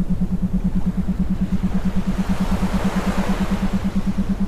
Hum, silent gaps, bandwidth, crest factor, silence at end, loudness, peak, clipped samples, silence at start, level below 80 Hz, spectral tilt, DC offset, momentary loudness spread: none; none; 13.5 kHz; 12 dB; 0 s; -22 LUFS; -8 dBFS; under 0.1%; 0 s; -26 dBFS; -7.5 dB/octave; under 0.1%; 2 LU